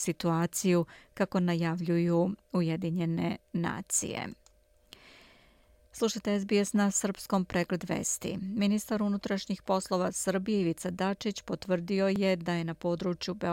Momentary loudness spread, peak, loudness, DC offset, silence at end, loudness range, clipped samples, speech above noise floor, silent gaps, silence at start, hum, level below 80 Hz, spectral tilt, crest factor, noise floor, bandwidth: 6 LU; -14 dBFS; -31 LUFS; under 0.1%; 0 s; 4 LU; under 0.1%; 34 dB; none; 0 s; none; -62 dBFS; -5 dB/octave; 16 dB; -64 dBFS; 17 kHz